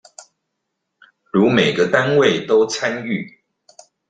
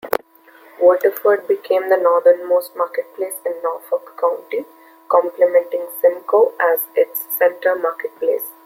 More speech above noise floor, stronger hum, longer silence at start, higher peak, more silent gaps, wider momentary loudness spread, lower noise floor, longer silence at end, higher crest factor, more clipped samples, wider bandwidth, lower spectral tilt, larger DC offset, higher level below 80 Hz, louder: first, 60 dB vs 30 dB; neither; first, 1.35 s vs 0.05 s; about the same, -2 dBFS vs 0 dBFS; neither; about the same, 11 LU vs 10 LU; first, -76 dBFS vs -47 dBFS; first, 0.8 s vs 0.15 s; about the same, 18 dB vs 18 dB; neither; second, 9.2 kHz vs 16.5 kHz; first, -5 dB/octave vs -3 dB/octave; neither; first, -60 dBFS vs -72 dBFS; about the same, -17 LUFS vs -18 LUFS